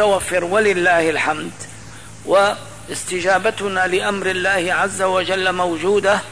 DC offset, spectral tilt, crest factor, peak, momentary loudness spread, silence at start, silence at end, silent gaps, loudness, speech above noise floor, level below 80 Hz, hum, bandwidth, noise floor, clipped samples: 0.8%; -3.5 dB/octave; 12 dB; -6 dBFS; 14 LU; 0 s; 0 s; none; -17 LUFS; 20 dB; -50 dBFS; none; 11 kHz; -37 dBFS; under 0.1%